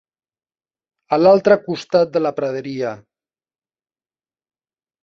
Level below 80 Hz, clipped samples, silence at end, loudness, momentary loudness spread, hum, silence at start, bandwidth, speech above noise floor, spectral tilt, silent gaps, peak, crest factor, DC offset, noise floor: -62 dBFS; under 0.1%; 2.05 s; -17 LUFS; 12 LU; none; 1.1 s; 7.4 kHz; over 74 dB; -6.5 dB/octave; none; -2 dBFS; 18 dB; under 0.1%; under -90 dBFS